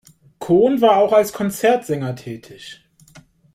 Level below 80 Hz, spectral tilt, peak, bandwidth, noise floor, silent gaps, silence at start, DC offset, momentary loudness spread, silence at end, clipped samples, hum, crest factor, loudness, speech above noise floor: -58 dBFS; -6 dB/octave; -2 dBFS; 16.5 kHz; -49 dBFS; none; 0.4 s; under 0.1%; 22 LU; 0.35 s; under 0.1%; none; 16 dB; -17 LUFS; 32 dB